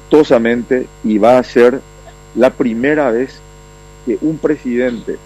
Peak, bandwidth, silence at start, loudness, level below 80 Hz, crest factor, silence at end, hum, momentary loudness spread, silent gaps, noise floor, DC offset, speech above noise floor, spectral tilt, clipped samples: 0 dBFS; 13 kHz; 0.1 s; -13 LUFS; -42 dBFS; 14 dB; 0.1 s; 50 Hz at -40 dBFS; 11 LU; none; -38 dBFS; under 0.1%; 25 dB; -6.5 dB/octave; under 0.1%